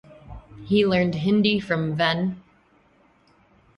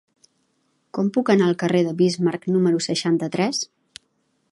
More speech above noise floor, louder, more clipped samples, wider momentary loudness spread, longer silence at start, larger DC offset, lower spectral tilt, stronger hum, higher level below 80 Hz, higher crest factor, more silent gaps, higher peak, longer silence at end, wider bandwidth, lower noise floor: second, 38 dB vs 49 dB; about the same, -22 LUFS vs -21 LUFS; neither; first, 22 LU vs 7 LU; second, 0.1 s vs 0.95 s; neither; first, -7.5 dB/octave vs -5.5 dB/octave; neither; first, -52 dBFS vs -68 dBFS; about the same, 20 dB vs 18 dB; neither; about the same, -6 dBFS vs -4 dBFS; first, 1.4 s vs 0.85 s; second, 6.8 kHz vs 11.5 kHz; second, -59 dBFS vs -69 dBFS